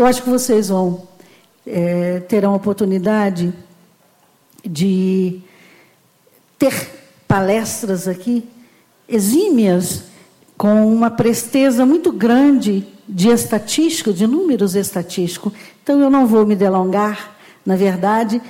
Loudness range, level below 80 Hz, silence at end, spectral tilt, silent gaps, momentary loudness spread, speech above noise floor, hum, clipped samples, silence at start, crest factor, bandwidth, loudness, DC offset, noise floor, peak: 6 LU; -52 dBFS; 0 s; -5.5 dB/octave; none; 12 LU; 40 dB; none; under 0.1%; 0 s; 12 dB; 17 kHz; -16 LUFS; under 0.1%; -54 dBFS; -4 dBFS